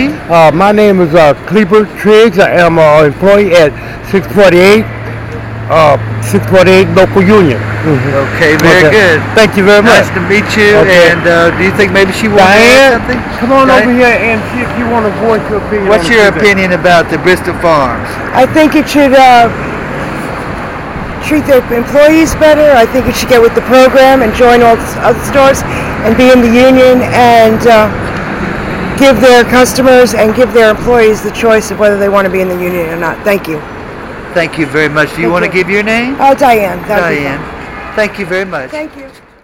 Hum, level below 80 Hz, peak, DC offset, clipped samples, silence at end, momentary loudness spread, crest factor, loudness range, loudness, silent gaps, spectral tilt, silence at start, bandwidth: none; -30 dBFS; 0 dBFS; 0.4%; 3%; 0.35 s; 12 LU; 6 dB; 5 LU; -7 LUFS; none; -5 dB/octave; 0 s; 17 kHz